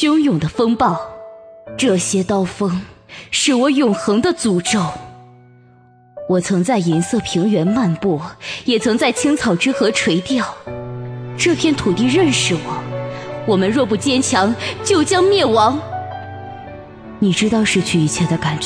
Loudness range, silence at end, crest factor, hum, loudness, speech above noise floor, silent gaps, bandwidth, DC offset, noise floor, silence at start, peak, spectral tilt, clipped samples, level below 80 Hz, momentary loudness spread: 3 LU; 0 s; 14 dB; none; -16 LUFS; 32 dB; none; 11 kHz; under 0.1%; -48 dBFS; 0 s; -2 dBFS; -4.5 dB/octave; under 0.1%; -48 dBFS; 15 LU